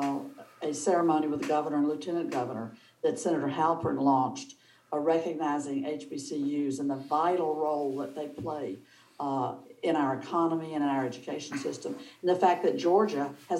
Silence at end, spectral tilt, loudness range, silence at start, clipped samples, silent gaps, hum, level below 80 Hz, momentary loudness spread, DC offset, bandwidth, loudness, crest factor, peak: 0 s; -5.5 dB/octave; 3 LU; 0 s; under 0.1%; none; none; -76 dBFS; 12 LU; under 0.1%; 12 kHz; -30 LUFS; 18 dB; -12 dBFS